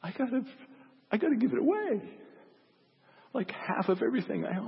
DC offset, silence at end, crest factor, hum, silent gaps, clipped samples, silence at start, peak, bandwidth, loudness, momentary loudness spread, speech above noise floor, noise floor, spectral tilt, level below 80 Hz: under 0.1%; 0 s; 16 dB; none; none; under 0.1%; 0 s; -16 dBFS; 5.8 kHz; -31 LUFS; 9 LU; 35 dB; -66 dBFS; -10.5 dB/octave; -84 dBFS